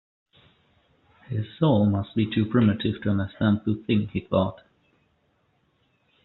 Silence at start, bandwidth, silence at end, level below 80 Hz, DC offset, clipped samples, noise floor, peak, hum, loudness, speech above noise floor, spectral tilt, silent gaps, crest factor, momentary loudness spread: 1.3 s; 4.2 kHz; 1.7 s; -58 dBFS; under 0.1%; under 0.1%; -68 dBFS; -8 dBFS; none; -24 LUFS; 45 dB; -7 dB/octave; none; 18 dB; 8 LU